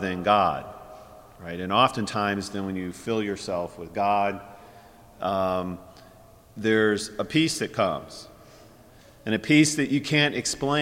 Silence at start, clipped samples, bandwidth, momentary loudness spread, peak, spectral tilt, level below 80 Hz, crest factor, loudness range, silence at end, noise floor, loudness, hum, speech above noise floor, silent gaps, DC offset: 0 s; under 0.1%; 16.5 kHz; 18 LU; -6 dBFS; -4.5 dB/octave; -56 dBFS; 20 dB; 4 LU; 0 s; -52 dBFS; -25 LUFS; none; 27 dB; none; under 0.1%